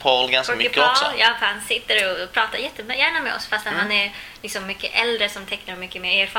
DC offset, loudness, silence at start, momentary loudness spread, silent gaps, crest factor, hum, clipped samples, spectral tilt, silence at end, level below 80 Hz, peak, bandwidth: under 0.1%; -20 LUFS; 0 s; 12 LU; none; 20 dB; none; under 0.1%; -1.5 dB/octave; 0 s; -54 dBFS; -2 dBFS; 17 kHz